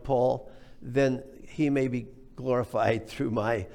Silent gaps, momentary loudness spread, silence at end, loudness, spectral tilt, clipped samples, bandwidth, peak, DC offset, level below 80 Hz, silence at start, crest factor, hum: none; 11 LU; 0 s; -29 LUFS; -7.5 dB/octave; under 0.1%; 15 kHz; -12 dBFS; under 0.1%; -52 dBFS; 0 s; 16 dB; none